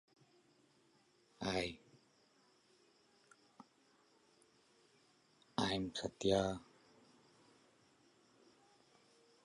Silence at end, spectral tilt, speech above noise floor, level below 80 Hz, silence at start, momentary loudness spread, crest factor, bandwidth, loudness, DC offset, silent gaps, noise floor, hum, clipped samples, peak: 2.8 s; -4.5 dB/octave; 34 dB; -68 dBFS; 1.4 s; 10 LU; 28 dB; 11 kHz; -40 LUFS; under 0.1%; none; -73 dBFS; none; under 0.1%; -20 dBFS